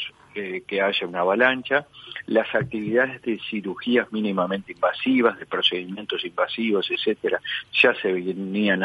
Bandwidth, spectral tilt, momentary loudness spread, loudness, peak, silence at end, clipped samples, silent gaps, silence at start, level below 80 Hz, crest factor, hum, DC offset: 11.5 kHz; -6.5 dB/octave; 10 LU; -23 LUFS; -2 dBFS; 0 s; under 0.1%; none; 0 s; -66 dBFS; 20 dB; none; under 0.1%